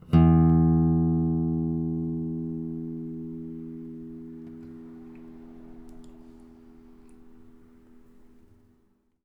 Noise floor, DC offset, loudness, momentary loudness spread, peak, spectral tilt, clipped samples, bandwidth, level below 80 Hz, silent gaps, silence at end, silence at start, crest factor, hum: -66 dBFS; under 0.1%; -25 LUFS; 27 LU; -8 dBFS; -11.5 dB/octave; under 0.1%; 3.1 kHz; -42 dBFS; none; 1.75 s; 0.1 s; 20 dB; none